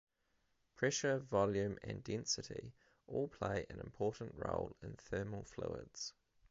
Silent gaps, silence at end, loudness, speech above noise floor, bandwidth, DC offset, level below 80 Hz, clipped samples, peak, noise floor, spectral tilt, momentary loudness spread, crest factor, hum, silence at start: none; 0.4 s; -41 LUFS; 39 dB; 7.6 kHz; under 0.1%; -62 dBFS; under 0.1%; -20 dBFS; -80 dBFS; -4.5 dB/octave; 12 LU; 22 dB; none; 0.8 s